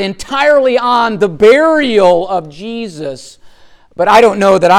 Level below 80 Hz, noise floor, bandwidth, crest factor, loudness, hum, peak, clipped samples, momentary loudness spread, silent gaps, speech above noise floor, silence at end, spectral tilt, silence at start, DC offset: -44 dBFS; -40 dBFS; 15.5 kHz; 10 dB; -10 LUFS; none; 0 dBFS; under 0.1%; 15 LU; none; 30 dB; 0 s; -5 dB/octave; 0 s; under 0.1%